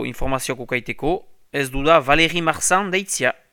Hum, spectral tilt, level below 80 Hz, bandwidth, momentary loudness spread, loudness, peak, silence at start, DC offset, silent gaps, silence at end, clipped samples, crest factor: none; -3 dB/octave; -36 dBFS; 19 kHz; 9 LU; -19 LUFS; 0 dBFS; 0 s; under 0.1%; none; 0.2 s; under 0.1%; 20 dB